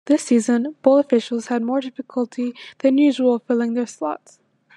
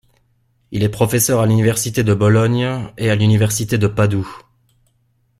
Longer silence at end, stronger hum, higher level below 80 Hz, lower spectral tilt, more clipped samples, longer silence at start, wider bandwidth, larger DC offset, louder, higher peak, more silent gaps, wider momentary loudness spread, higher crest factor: second, 0.65 s vs 1 s; neither; second, -80 dBFS vs -46 dBFS; about the same, -5 dB/octave vs -5.5 dB/octave; neither; second, 0.05 s vs 0.7 s; second, 11 kHz vs 15.5 kHz; neither; second, -20 LUFS vs -16 LUFS; about the same, -2 dBFS vs -2 dBFS; neither; first, 11 LU vs 8 LU; about the same, 18 dB vs 14 dB